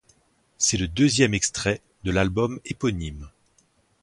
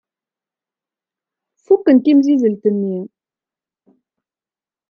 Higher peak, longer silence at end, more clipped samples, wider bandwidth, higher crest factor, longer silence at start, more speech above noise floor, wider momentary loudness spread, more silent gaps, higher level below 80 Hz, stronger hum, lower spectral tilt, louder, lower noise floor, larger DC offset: about the same, -2 dBFS vs -2 dBFS; second, 0.75 s vs 1.8 s; neither; first, 11.5 kHz vs 6.6 kHz; first, 22 dB vs 16 dB; second, 0.6 s vs 1.7 s; second, 41 dB vs over 77 dB; second, 11 LU vs 14 LU; neither; first, -42 dBFS vs -66 dBFS; neither; second, -4 dB/octave vs -8.5 dB/octave; second, -23 LUFS vs -14 LUFS; second, -64 dBFS vs under -90 dBFS; neither